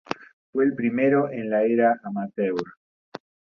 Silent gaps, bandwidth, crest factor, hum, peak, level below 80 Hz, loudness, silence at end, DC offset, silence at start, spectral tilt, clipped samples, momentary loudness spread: 0.33-0.53 s, 2.77-3.12 s; 6.8 kHz; 20 dB; none; -6 dBFS; -68 dBFS; -23 LUFS; 0.35 s; under 0.1%; 0.1 s; -8 dB/octave; under 0.1%; 23 LU